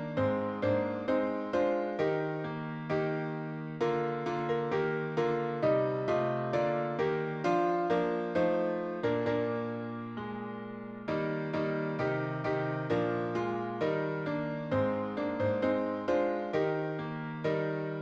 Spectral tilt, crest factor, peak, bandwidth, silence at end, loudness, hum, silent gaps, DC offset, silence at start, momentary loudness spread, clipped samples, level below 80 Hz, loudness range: -8 dB/octave; 14 dB; -18 dBFS; 7.8 kHz; 0 s; -32 LUFS; none; none; under 0.1%; 0 s; 7 LU; under 0.1%; -66 dBFS; 4 LU